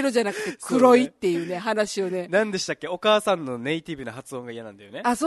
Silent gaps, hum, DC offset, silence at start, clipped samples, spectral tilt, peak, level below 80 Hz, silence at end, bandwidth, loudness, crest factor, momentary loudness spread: none; none; under 0.1%; 0 s; under 0.1%; -4.5 dB/octave; -4 dBFS; -64 dBFS; 0 s; 12.5 kHz; -23 LUFS; 20 dB; 17 LU